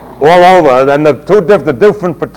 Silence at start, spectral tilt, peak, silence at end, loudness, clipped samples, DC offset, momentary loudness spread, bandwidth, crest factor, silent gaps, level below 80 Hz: 0 s; -6.5 dB/octave; 0 dBFS; 0.1 s; -7 LUFS; 10%; under 0.1%; 6 LU; 17 kHz; 8 dB; none; -40 dBFS